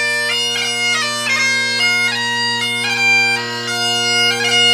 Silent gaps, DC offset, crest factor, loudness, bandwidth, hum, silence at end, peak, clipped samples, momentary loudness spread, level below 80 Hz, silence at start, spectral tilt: none; under 0.1%; 14 dB; -14 LUFS; 16 kHz; none; 0 s; -2 dBFS; under 0.1%; 5 LU; -66 dBFS; 0 s; -0.5 dB/octave